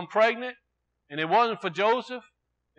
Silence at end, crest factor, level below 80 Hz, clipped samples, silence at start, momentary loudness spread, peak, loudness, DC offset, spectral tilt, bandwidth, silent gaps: 0.6 s; 18 dB; -82 dBFS; under 0.1%; 0 s; 15 LU; -8 dBFS; -25 LUFS; under 0.1%; -5 dB/octave; 8.4 kHz; none